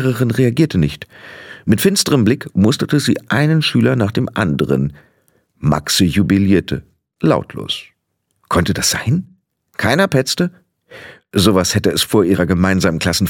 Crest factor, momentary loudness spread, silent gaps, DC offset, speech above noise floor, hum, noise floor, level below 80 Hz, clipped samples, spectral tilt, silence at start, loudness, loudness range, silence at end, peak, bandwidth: 16 dB; 10 LU; none; under 0.1%; 54 dB; none; -69 dBFS; -40 dBFS; under 0.1%; -5 dB/octave; 0 s; -15 LUFS; 3 LU; 0 s; 0 dBFS; 17.5 kHz